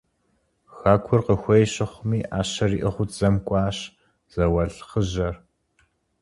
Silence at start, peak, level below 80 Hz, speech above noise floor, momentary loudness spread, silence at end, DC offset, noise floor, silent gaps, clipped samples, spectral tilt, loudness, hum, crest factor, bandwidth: 0.75 s; -2 dBFS; -40 dBFS; 47 dB; 9 LU; 0.85 s; under 0.1%; -69 dBFS; none; under 0.1%; -6.5 dB/octave; -23 LUFS; none; 22 dB; 11.5 kHz